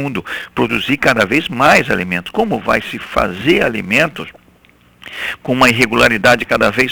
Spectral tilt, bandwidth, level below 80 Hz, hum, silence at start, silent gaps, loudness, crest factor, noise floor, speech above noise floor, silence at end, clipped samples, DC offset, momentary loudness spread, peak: -4.5 dB/octave; over 20 kHz; -40 dBFS; none; 0 s; none; -14 LUFS; 14 dB; -49 dBFS; 35 dB; 0 s; under 0.1%; under 0.1%; 12 LU; 0 dBFS